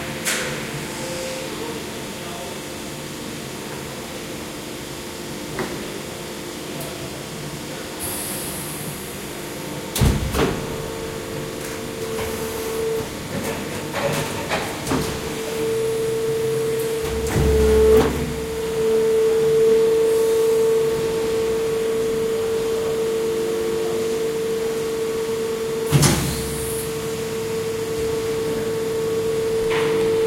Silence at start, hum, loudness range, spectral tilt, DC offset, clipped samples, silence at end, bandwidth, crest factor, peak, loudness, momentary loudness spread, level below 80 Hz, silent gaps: 0 s; none; 11 LU; -4.5 dB/octave; under 0.1%; under 0.1%; 0 s; 16.5 kHz; 20 dB; -2 dBFS; -23 LUFS; 13 LU; -36 dBFS; none